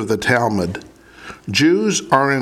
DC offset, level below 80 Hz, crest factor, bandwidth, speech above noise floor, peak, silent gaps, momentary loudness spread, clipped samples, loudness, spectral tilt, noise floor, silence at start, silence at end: under 0.1%; -50 dBFS; 18 dB; 15.5 kHz; 22 dB; 0 dBFS; none; 18 LU; under 0.1%; -17 LUFS; -4.5 dB/octave; -39 dBFS; 0 s; 0 s